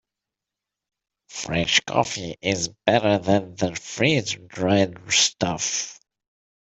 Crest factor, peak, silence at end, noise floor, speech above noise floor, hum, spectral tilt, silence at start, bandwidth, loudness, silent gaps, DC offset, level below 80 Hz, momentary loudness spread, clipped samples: 22 dB; -2 dBFS; 0.7 s; -87 dBFS; 64 dB; none; -3 dB/octave; 1.3 s; 8.4 kHz; -22 LUFS; none; under 0.1%; -56 dBFS; 9 LU; under 0.1%